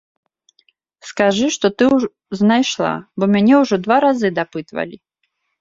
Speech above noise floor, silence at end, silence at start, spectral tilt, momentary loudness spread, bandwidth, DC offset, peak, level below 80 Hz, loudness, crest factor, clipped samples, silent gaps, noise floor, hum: 55 dB; 0.65 s; 1.05 s; -5 dB/octave; 13 LU; 7.8 kHz; under 0.1%; 0 dBFS; -58 dBFS; -16 LUFS; 18 dB; under 0.1%; none; -71 dBFS; none